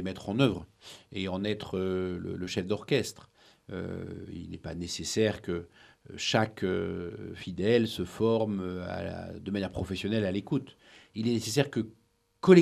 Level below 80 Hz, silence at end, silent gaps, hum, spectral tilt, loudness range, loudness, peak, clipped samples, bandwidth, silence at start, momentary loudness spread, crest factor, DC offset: -58 dBFS; 0 s; none; none; -5.5 dB/octave; 4 LU; -31 LUFS; -6 dBFS; under 0.1%; 13.5 kHz; 0 s; 13 LU; 24 dB; under 0.1%